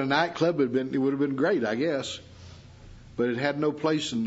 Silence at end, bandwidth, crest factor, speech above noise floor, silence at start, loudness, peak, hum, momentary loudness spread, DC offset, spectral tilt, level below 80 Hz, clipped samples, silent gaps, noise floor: 0 s; 8 kHz; 18 dB; 22 dB; 0 s; -27 LUFS; -8 dBFS; none; 7 LU; under 0.1%; -5.5 dB/octave; -60 dBFS; under 0.1%; none; -48 dBFS